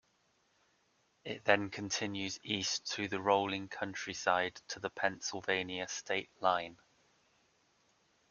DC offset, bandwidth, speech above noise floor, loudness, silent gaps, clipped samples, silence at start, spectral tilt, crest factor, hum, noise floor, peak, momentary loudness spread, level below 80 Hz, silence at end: under 0.1%; 7.4 kHz; 39 dB; -35 LUFS; none; under 0.1%; 1.25 s; -2.5 dB/octave; 28 dB; none; -75 dBFS; -10 dBFS; 9 LU; -76 dBFS; 1.55 s